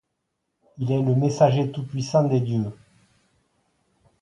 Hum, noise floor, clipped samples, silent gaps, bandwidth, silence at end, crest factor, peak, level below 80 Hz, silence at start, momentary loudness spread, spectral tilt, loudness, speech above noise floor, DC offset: none; -78 dBFS; under 0.1%; none; 9 kHz; 1.5 s; 20 dB; -6 dBFS; -62 dBFS; 0.8 s; 10 LU; -8 dB/octave; -23 LUFS; 56 dB; under 0.1%